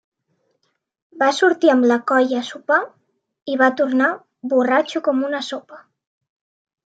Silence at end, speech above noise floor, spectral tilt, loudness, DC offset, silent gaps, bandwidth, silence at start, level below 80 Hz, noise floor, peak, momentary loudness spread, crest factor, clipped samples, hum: 1.05 s; 53 dB; -3.5 dB/octave; -18 LUFS; under 0.1%; 3.42-3.46 s; 9 kHz; 1.15 s; -78 dBFS; -71 dBFS; -2 dBFS; 13 LU; 18 dB; under 0.1%; none